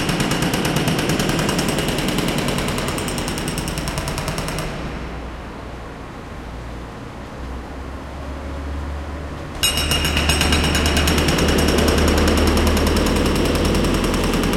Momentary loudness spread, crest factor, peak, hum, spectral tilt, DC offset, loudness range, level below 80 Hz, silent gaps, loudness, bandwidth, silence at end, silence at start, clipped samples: 16 LU; 18 dB; -2 dBFS; none; -4.5 dB/octave; under 0.1%; 15 LU; -26 dBFS; none; -19 LUFS; 17 kHz; 0 s; 0 s; under 0.1%